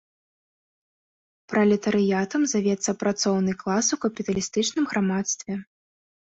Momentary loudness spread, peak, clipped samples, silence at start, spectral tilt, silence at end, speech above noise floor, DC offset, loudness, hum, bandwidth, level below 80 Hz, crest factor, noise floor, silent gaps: 6 LU; -10 dBFS; under 0.1%; 1.5 s; -4.5 dB/octave; 0.75 s; over 66 dB; under 0.1%; -24 LUFS; none; 8 kHz; -62 dBFS; 16 dB; under -90 dBFS; none